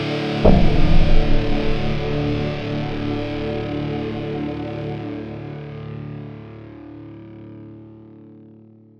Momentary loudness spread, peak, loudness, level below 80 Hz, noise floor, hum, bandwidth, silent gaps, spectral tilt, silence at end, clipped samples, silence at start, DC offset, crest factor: 21 LU; -2 dBFS; -23 LUFS; -22 dBFS; -46 dBFS; none; 6 kHz; none; -8 dB/octave; 0.7 s; under 0.1%; 0 s; under 0.1%; 18 dB